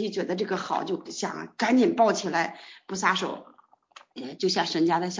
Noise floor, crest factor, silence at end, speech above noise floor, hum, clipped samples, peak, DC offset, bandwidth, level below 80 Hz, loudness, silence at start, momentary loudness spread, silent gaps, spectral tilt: -54 dBFS; 20 dB; 0 s; 28 dB; none; under 0.1%; -8 dBFS; under 0.1%; 7.6 kHz; -72 dBFS; -26 LUFS; 0 s; 17 LU; none; -4 dB/octave